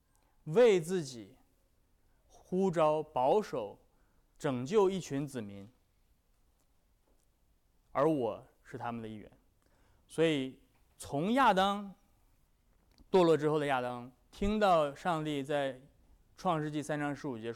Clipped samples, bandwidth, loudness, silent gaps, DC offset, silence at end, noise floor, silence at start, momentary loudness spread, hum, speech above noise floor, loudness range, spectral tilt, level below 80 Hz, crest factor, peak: under 0.1%; 15 kHz; -32 LUFS; none; under 0.1%; 0 s; -71 dBFS; 0.45 s; 19 LU; none; 40 dB; 7 LU; -6 dB/octave; -58 dBFS; 16 dB; -18 dBFS